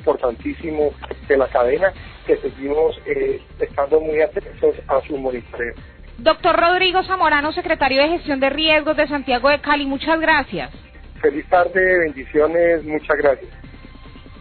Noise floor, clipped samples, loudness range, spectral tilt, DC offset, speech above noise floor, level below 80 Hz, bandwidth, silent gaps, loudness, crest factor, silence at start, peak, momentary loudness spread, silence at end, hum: -39 dBFS; under 0.1%; 4 LU; -9.5 dB/octave; under 0.1%; 21 dB; -40 dBFS; 4.6 kHz; none; -18 LUFS; 16 dB; 0 s; -4 dBFS; 10 LU; 0 s; none